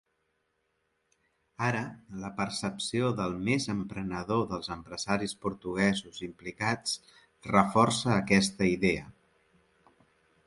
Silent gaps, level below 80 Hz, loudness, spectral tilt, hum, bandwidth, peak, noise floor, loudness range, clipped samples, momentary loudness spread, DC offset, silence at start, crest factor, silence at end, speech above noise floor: none; -58 dBFS; -30 LUFS; -5 dB/octave; none; 11.5 kHz; -6 dBFS; -77 dBFS; 5 LU; under 0.1%; 13 LU; under 0.1%; 1.6 s; 24 dB; 1.35 s; 47 dB